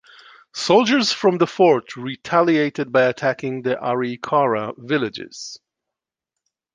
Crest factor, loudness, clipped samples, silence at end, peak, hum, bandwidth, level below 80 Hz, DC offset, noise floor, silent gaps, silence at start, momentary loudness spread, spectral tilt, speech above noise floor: 18 dB; -19 LUFS; under 0.1%; 1.2 s; -2 dBFS; none; 9.8 kHz; -66 dBFS; under 0.1%; -85 dBFS; none; 0.55 s; 14 LU; -5 dB/octave; 66 dB